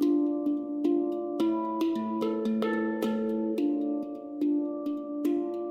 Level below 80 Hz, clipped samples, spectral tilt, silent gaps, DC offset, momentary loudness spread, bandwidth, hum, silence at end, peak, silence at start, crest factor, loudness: -74 dBFS; under 0.1%; -7 dB/octave; none; under 0.1%; 4 LU; 15.5 kHz; none; 0 s; -16 dBFS; 0 s; 12 dB; -30 LUFS